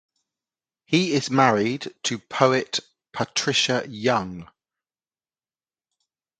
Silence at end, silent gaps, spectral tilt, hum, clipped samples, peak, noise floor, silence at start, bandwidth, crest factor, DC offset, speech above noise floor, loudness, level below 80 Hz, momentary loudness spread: 1.95 s; none; -4 dB/octave; none; under 0.1%; -2 dBFS; under -90 dBFS; 0.9 s; 9.4 kHz; 24 dB; under 0.1%; over 67 dB; -22 LUFS; -64 dBFS; 11 LU